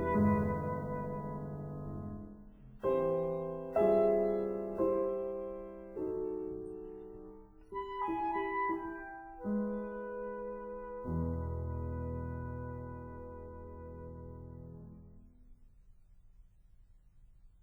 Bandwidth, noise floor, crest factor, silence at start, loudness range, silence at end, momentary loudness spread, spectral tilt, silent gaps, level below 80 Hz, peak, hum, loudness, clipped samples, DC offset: 4.3 kHz; -61 dBFS; 18 dB; 0 s; 17 LU; 0.15 s; 18 LU; -10 dB/octave; none; -52 dBFS; -18 dBFS; none; -37 LUFS; under 0.1%; under 0.1%